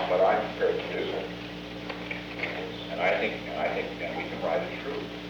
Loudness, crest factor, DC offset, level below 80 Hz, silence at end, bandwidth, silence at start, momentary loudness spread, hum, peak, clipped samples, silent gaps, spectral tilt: -30 LUFS; 18 dB; under 0.1%; -54 dBFS; 0 s; over 20 kHz; 0 s; 11 LU; 60 Hz at -55 dBFS; -12 dBFS; under 0.1%; none; -5.5 dB/octave